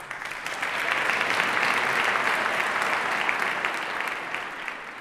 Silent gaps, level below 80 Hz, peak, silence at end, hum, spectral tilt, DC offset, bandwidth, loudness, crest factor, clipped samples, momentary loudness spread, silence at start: none; -64 dBFS; -6 dBFS; 0 s; none; -1.5 dB/octave; under 0.1%; 16 kHz; -25 LUFS; 20 dB; under 0.1%; 9 LU; 0 s